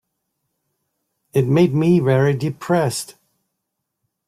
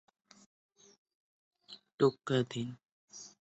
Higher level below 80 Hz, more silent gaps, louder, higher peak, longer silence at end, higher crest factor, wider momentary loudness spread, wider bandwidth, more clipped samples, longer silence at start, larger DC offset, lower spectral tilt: first, -58 dBFS vs -76 dBFS; second, none vs 1.94-1.98 s, 2.85-3.08 s; first, -18 LUFS vs -33 LUFS; first, -4 dBFS vs -14 dBFS; first, 1.15 s vs 0.15 s; second, 16 dB vs 24 dB; second, 8 LU vs 23 LU; first, 15.5 kHz vs 8.2 kHz; neither; second, 1.35 s vs 1.7 s; neither; about the same, -7 dB/octave vs -6 dB/octave